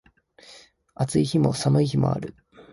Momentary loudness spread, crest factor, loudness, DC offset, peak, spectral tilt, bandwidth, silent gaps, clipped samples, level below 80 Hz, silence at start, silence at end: 10 LU; 18 dB; -23 LUFS; under 0.1%; -8 dBFS; -7 dB/octave; 11.5 kHz; none; under 0.1%; -52 dBFS; 0.5 s; 0.1 s